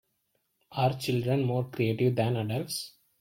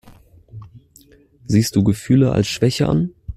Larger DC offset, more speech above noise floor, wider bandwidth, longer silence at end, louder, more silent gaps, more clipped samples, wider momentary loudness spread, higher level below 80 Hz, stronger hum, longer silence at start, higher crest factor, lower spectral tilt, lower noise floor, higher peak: neither; first, 48 dB vs 34 dB; about the same, 16.5 kHz vs 15 kHz; first, 0.3 s vs 0.05 s; second, -29 LUFS vs -17 LUFS; neither; neither; first, 9 LU vs 4 LU; second, -64 dBFS vs -42 dBFS; neither; first, 0.7 s vs 0.55 s; about the same, 16 dB vs 16 dB; about the same, -6 dB/octave vs -6.5 dB/octave; first, -76 dBFS vs -50 dBFS; second, -14 dBFS vs -2 dBFS